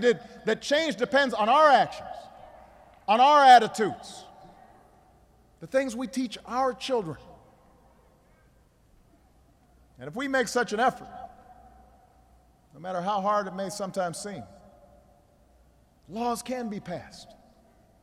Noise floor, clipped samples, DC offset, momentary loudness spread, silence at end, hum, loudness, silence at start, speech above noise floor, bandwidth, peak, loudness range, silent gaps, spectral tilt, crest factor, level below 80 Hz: -61 dBFS; under 0.1%; under 0.1%; 24 LU; 0.8 s; none; -25 LUFS; 0 s; 36 dB; 14 kHz; -6 dBFS; 15 LU; none; -3.5 dB/octave; 22 dB; -62 dBFS